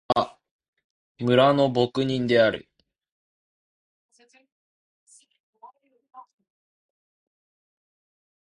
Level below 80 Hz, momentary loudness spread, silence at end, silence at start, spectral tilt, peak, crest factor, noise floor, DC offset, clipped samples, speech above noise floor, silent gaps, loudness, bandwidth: -64 dBFS; 12 LU; 2.2 s; 0.1 s; -6.5 dB/octave; -6 dBFS; 22 dB; -53 dBFS; under 0.1%; under 0.1%; 32 dB; 0.51-0.59 s, 0.68-0.73 s, 0.84-1.15 s, 3.12-4.09 s, 4.52-5.07 s, 5.40-5.53 s; -22 LUFS; 11 kHz